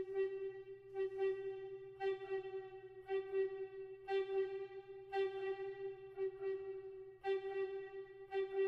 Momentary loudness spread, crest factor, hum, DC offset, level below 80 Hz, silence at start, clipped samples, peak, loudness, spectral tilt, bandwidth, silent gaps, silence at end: 11 LU; 14 dB; none; under 0.1%; -78 dBFS; 0 s; under 0.1%; -30 dBFS; -44 LUFS; -6.5 dB/octave; 5.4 kHz; none; 0 s